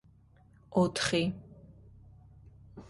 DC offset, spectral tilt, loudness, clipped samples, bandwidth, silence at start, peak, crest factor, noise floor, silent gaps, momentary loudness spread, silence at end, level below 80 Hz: under 0.1%; -5 dB/octave; -30 LUFS; under 0.1%; 11.5 kHz; 0.7 s; -16 dBFS; 20 dB; -61 dBFS; none; 24 LU; 0.05 s; -60 dBFS